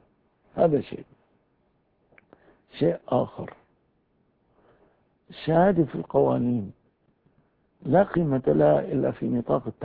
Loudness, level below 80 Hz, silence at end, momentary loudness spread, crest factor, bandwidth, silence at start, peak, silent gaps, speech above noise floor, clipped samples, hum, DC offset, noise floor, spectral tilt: -24 LUFS; -56 dBFS; 0 s; 19 LU; 20 dB; 4.8 kHz; 0.55 s; -6 dBFS; none; 45 dB; under 0.1%; none; under 0.1%; -68 dBFS; -12 dB/octave